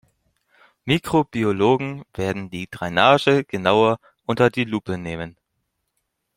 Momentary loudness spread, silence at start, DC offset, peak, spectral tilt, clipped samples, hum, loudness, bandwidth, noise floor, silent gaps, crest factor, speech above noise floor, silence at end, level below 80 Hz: 14 LU; 0.85 s; under 0.1%; -2 dBFS; -6 dB/octave; under 0.1%; none; -20 LUFS; 16.5 kHz; -75 dBFS; none; 20 dB; 55 dB; 1.05 s; -54 dBFS